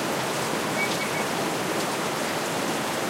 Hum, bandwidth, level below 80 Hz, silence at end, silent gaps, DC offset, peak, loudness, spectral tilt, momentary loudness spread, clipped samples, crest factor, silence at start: none; 16 kHz; -62 dBFS; 0 s; none; under 0.1%; -12 dBFS; -26 LUFS; -3 dB/octave; 2 LU; under 0.1%; 14 dB; 0 s